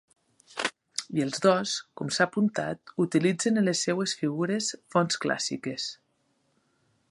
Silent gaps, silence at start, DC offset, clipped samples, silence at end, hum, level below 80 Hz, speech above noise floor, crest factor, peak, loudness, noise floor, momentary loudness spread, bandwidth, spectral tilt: none; 0.55 s; under 0.1%; under 0.1%; 1.15 s; none; -74 dBFS; 45 dB; 22 dB; -8 dBFS; -28 LUFS; -72 dBFS; 8 LU; 11.5 kHz; -4 dB/octave